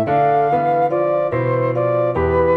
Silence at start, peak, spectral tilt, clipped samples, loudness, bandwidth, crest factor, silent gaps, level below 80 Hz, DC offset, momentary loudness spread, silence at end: 0 s; -4 dBFS; -10 dB/octave; under 0.1%; -17 LUFS; 5.2 kHz; 12 dB; none; -40 dBFS; under 0.1%; 3 LU; 0 s